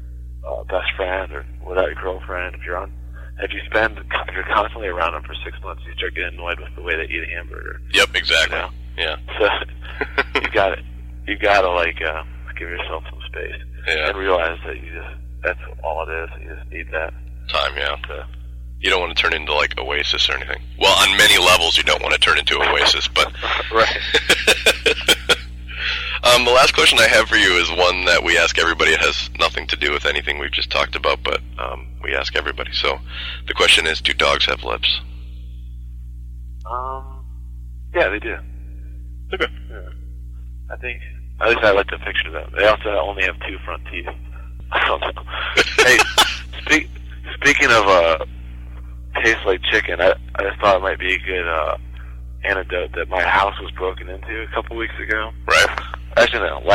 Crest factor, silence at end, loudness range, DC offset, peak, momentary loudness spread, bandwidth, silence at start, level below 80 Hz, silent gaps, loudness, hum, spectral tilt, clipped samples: 16 dB; 0 s; 11 LU; under 0.1%; -4 dBFS; 22 LU; 16 kHz; 0 s; -32 dBFS; none; -17 LUFS; 60 Hz at -35 dBFS; -2.5 dB/octave; under 0.1%